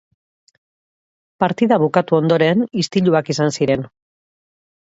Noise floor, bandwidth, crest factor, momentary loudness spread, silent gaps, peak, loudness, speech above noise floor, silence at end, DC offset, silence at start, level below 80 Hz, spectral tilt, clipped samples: under -90 dBFS; 8 kHz; 18 dB; 6 LU; none; 0 dBFS; -17 LUFS; over 74 dB; 1.1 s; under 0.1%; 1.4 s; -58 dBFS; -6 dB/octave; under 0.1%